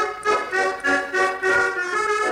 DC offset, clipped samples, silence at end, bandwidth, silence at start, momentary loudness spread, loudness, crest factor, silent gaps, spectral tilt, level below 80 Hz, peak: under 0.1%; under 0.1%; 0 s; 16.5 kHz; 0 s; 3 LU; -21 LUFS; 12 dB; none; -2.5 dB/octave; -58 dBFS; -8 dBFS